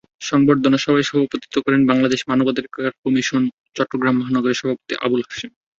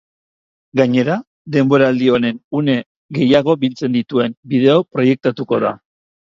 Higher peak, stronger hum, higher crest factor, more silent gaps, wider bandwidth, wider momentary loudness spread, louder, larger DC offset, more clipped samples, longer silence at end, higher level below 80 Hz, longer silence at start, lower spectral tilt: about the same, -2 dBFS vs 0 dBFS; neither; about the same, 18 dB vs 16 dB; second, 2.98-3.03 s, 3.53-3.64 s vs 1.27-1.45 s, 2.44-2.51 s, 2.86-3.09 s, 4.37-4.43 s; about the same, 7.6 kHz vs 7.4 kHz; about the same, 8 LU vs 8 LU; second, -19 LUFS vs -16 LUFS; neither; neither; second, 0.3 s vs 0.55 s; about the same, -58 dBFS vs -58 dBFS; second, 0.2 s vs 0.75 s; second, -5.5 dB/octave vs -7.5 dB/octave